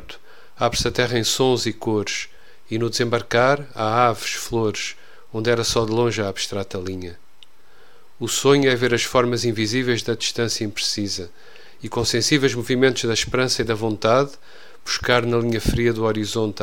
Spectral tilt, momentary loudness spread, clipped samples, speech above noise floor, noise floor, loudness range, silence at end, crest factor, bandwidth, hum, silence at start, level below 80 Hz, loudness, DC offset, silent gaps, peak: -4 dB/octave; 11 LU; under 0.1%; 33 dB; -54 dBFS; 3 LU; 0 s; 20 dB; 17 kHz; none; 0 s; -42 dBFS; -21 LUFS; 1%; none; 0 dBFS